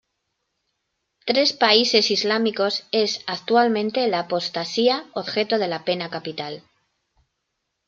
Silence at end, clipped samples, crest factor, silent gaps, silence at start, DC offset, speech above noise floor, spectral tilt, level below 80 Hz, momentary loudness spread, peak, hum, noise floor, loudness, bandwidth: 1.3 s; under 0.1%; 20 dB; none; 1.25 s; under 0.1%; 56 dB; -3.5 dB/octave; -72 dBFS; 13 LU; -2 dBFS; none; -77 dBFS; -21 LUFS; 7.6 kHz